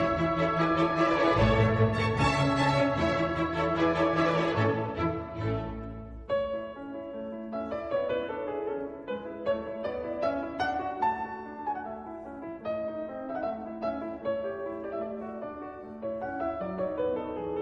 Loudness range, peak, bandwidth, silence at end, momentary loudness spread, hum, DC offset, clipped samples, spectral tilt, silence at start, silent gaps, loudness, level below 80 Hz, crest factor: 9 LU; -12 dBFS; 10.5 kHz; 0 s; 13 LU; none; under 0.1%; under 0.1%; -7 dB/octave; 0 s; none; -30 LUFS; -48 dBFS; 18 dB